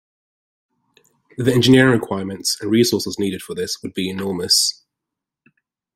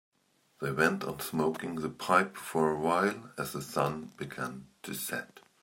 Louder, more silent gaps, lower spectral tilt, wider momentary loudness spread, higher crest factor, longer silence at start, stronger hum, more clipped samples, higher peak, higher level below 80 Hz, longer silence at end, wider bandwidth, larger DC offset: first, -18 LUFS vs -32 LUFS; neither; about the same, -4 dB/octave vs -5 dB/octave; about the same, 12 LU vs 12 LU; about the same, 20 dB vs 24 dB; first, 1.4 s vs 0.6 s; neither; neither; first, 0 dBFS vs -10 dBFS; first, -56 dBFS vs -68 dBFS; first, 1.25 s vs 0.25 s; about the same, 16 kHz vs 16.5 kHz; neither